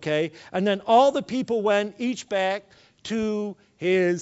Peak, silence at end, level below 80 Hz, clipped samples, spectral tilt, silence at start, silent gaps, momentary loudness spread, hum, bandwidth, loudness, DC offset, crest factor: -6 dBFS; 0 s; -66 dBFS; under 0.1%; -5.5 dB/octave; 0 s; none; 12 LU; none; 8 kHz; -24 LUFS; under 0.1%; 18 dB